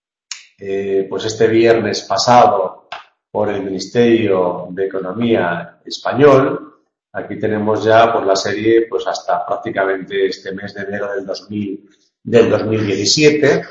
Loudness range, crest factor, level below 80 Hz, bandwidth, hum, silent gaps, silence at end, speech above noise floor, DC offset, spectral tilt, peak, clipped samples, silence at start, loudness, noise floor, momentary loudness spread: 4 LU; 16 dB; -54 dBFS; 8 kHz; none; none; 0 s; 21 dB; under 0.1%; -4.5 dB/octave; 0 dBFS; under 0.1%; 0.3 s; -15 LUFS; -36 dBFS; 16 LU